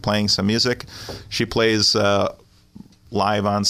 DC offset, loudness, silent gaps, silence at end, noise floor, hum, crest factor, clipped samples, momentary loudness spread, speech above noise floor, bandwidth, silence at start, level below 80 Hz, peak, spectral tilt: under 0.1%; -19 LUFS; none; 0 s; -45 dBFS; none; 16 dB; under 0.1%; 12 LU; 25 dB; 15.5 kHz; 0.05 s; -48 dBFS; -6 dBFS; -4 dB/octave